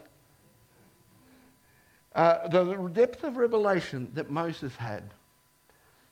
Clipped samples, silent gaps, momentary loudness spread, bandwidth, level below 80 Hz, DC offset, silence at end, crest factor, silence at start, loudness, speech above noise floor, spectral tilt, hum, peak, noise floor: under 0.1%; none; 13 LU; 15.5 kHz; -68 dBFS; under 0.1%; 1 s; 22 dB; 2.15 s; -28 LUFS; 38 dB; -7 dB/octave; none; -8 dBFS; -65 dBFS